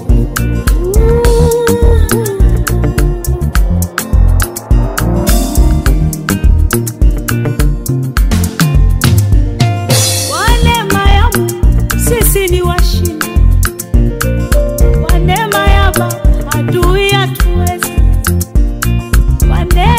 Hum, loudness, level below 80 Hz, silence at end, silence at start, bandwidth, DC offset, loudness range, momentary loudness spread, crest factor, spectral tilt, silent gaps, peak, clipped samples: none; -11 LUFS; -12 dBFS; 0 s; 0 s; 16.5 kHz; under 0.1%; 2 LU; 4 LU; 10 dB; -5 dB/octave; none; 0 dBFS; under 0.1%